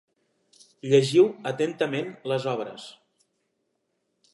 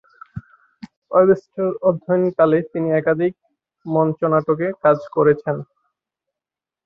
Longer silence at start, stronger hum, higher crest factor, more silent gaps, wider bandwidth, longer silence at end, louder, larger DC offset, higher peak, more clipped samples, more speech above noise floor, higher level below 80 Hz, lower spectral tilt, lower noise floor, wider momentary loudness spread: first, 0.85 s vs 0.35 s; neither; about the same, 20 dB vs 18 dB; second, none vs 0.97-1.02 s; first, 11.5 kHz vs 6 kHz; first, 1.4 s vs 1.2 s; second, -24 LUFS vs -19 LUFS; neither; second, -8 dBFS vs -2 dBFS; neither; second, 52 dB vs 71 dB; second, -80 dBFS vs -60 dBFS; second, -6 dB/octave vs -10 dB/octave; second, -76 dBFS vs -88 dBFS; first, 19 LU vs 13 LU